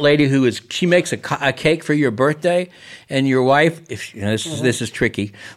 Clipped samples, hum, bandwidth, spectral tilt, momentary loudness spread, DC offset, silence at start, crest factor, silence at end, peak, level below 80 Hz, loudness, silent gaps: under 0.1%; none; 14.5 kHz; -5.5 dB/octave; 9 LU; under 0.1%; 0 s; 16 dB; 0.05 s; -2 dBFS; -52 dBFS; -18 LUFS; none